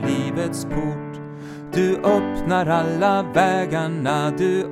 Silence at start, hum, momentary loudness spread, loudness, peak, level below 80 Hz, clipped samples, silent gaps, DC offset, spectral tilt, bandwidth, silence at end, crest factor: 0 s; none; 12 LU; -21 LUFS; -4 dBFS; -44 dBFS; under 0.1%; none; under 0.1%; -6.5 dB/octave; 15 kHz; 0 s; 16 dB